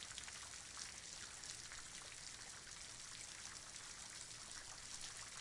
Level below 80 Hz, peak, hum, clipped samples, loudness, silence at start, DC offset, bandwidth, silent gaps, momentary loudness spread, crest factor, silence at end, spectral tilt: -70 dBFS; -32 dBFS; none; under 0.1%; -51 LUFS; 0 s; under 0.1%; 12 kHz; none; 2 LU; 22 dB; 0 s; 0 dB/octave